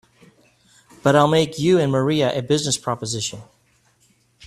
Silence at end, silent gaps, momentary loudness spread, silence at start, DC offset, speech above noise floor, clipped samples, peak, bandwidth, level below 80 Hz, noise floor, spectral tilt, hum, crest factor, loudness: 1.05 s; none; 10 LU; 1.05 s; under 0.1%; 42 dB; under 0.1%; -2 dBFS; 13.5 kHz; -56 dBFS; -61 dBFS; -5 dB/octave; none; 20 dB; -19 LUFS